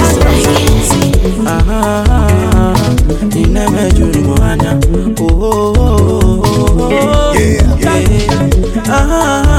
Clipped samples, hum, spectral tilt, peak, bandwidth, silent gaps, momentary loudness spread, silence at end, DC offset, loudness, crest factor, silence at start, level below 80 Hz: 0.7%; none; -6 dB/octave; 0 dBFS; 17 kHz; none; 3 LU; 0 s; under 0.1%; -10 LUFS; 8 dB; 0 s; -14 dBFS